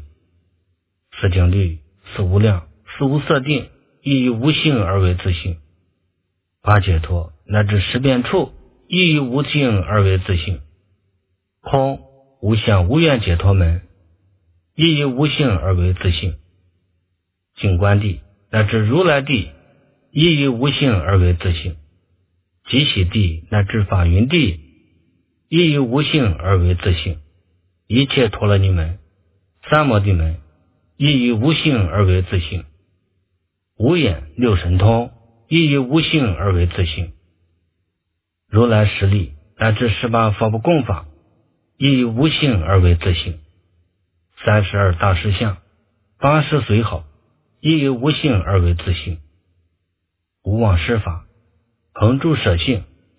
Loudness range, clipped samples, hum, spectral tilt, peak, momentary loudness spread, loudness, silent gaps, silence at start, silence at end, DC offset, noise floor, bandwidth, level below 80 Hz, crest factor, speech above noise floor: 3 LU; under 0.1%; none; -11 dB/octave; 0 dBFS; 11 LU; -17 LUFS; none; 0 s; 0.35 s; under 0.1%; -75 dBFS; 4 kHz; -28 dBFS; 18 dB; 60 dB